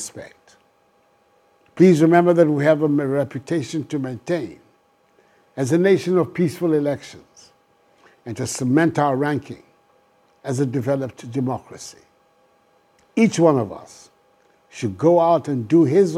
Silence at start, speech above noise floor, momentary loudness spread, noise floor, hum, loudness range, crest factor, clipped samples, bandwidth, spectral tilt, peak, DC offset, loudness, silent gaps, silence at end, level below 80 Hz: 0 s; 41 dB; 21 LU; -60 dBFS; none; 7 LU; 20 dB; under 0.1%; 14 kHz; -7 dB/octave; 0 dBFS; under 0.1%; -19 LUFS; none; 0 s; -66 dBFS